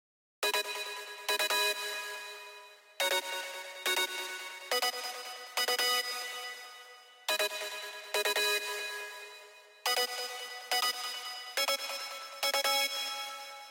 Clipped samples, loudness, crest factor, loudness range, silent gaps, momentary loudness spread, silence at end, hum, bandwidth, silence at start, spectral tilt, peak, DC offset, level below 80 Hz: under 0.1%; -32 LUFS; 18 dB; 2 LU; none; 14 LU; 0 s; none; 17 kHz; 0.4 s; 3 dB/octave; -16 dBFS; under 0.1%; under -90 dBFS